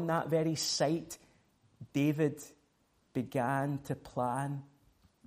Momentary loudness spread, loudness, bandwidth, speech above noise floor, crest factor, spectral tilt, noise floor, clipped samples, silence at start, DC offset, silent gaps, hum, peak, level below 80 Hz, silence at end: 15 LU; -34 LUFS; 15.5 kHz; 40 dB; 16 dB; -5 dB/octave; -73 dBFS; under 0.1%; 0 s; under 0.1%; none; none; -18 dBFS; -70 dBFS; 0.6 s